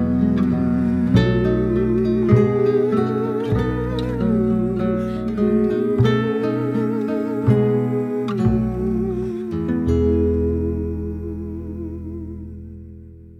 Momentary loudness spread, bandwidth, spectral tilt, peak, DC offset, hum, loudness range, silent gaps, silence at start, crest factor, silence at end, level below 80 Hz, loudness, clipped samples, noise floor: 13 LU; 7.8 kHz; -9.5 dB/octave; -2 dBFS; under 0.1%; none; 5 LU; none; 0 s; 18 dB; 0 s; -34 dBFS; -20 LUFS; under 0.1%; -40 dBFS